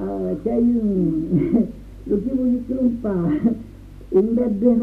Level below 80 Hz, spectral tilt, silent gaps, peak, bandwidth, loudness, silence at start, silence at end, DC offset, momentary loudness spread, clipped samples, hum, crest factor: -40 dBFS; -11 dB/octave; none; -6 dBFS; 3.4 kHz; -21 LUFS; 0 s; 0 s; under 0.1%; 7 LU; under 0.1%; none; 14 dB